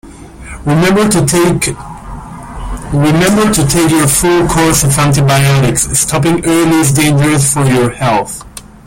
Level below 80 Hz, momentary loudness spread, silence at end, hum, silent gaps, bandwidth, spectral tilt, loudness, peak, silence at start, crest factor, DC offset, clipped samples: -30 dBFS; 17 LU; 0.2 s; none; none; 17 kHz; -4.5 dB/octave; -10 LUFS; 0 dBFS; 0.05 s; 10 dB; under 0.1%; under 0.1%